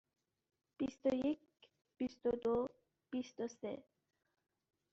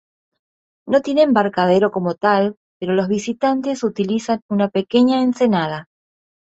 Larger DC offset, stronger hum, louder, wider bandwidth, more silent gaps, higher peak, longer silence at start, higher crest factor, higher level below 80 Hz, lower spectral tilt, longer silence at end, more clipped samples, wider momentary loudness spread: neither; neither; second, -41 LUFS vs -18 LUFS; about the same, 7.8 kHz vs 8 kHz; second, none vs 2.57-2.80 s, 4.42-4.49 s; second, -24 dBFS vs -2 dBFS; about the same, 0.8 s vs 0.85 s; about the same, 18 dB vs 16 dB; second, -74 dBFS vs -60 dBFS; about the same, -5.5 dB/octave vs -6 dB/octave; first, 1.1 s vs 0.75 s; neither; first, 10 LU vs 6 LU